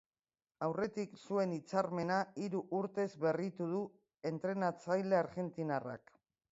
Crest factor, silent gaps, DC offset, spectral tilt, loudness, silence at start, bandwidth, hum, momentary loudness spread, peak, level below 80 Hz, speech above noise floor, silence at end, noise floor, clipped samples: 20 dB; none; under 0.1%; -6 dB/octave; -38 LUFS; 0.6 s; 7.6 kHz; none; 7 LU; -18 dBFS; -80 dBFS; over 53 dB; 0.55 s; under -90 dBFS; under 0.1%